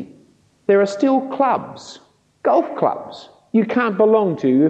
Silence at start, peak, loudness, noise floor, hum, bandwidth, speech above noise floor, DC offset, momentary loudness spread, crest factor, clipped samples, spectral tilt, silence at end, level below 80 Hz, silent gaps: 0 s; -2 dBFS; -18 LUFS; -54 dBFS; none; 8.6 kHz; 37 dB; under 0.1%; 21 LU; 16 dB; under 0.1%; -7 dB/octave; 0 s; -70 dBFS; none